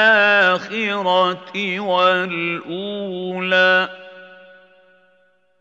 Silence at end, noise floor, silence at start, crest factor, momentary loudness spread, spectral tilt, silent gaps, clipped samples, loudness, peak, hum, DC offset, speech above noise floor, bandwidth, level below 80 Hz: 1.25 s; -60 dBFS; 0 s; 18 dB; 13 LU; -5 dB/octave; none; under 0.1%; -18 LUFS; -2 dBFS; none; under 0.1%; 41 dB; 7.8 kHz; -80 dBFS